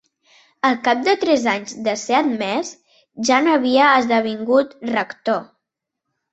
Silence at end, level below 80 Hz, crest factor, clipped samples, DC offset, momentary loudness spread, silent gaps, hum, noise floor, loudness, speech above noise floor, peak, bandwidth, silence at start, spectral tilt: 0.9 s; -66 dBFS; 18 dB; under 0.1%; under 0.1%; 10 LU; none; none; -81 dBFS; -18 LUFS; 63 dB; -2 dBFS; 8.2 kHz; 0.65 s; -3.5 dB/octave